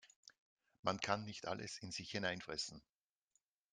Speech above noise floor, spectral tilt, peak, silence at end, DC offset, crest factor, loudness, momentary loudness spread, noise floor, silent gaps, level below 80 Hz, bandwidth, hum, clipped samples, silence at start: 40 dB; -3.5 dB/octave; -20 dBFS; 0.9 s; under 0.1%; 26 dB; -43 LUFS; 7 LU; -84 dBFS; 0.16-0.23 s, 0.38-0.57 s, 0.79-0.83 s; -76 dBFS; 11 kHz; none; under 0.1%; 0.05 s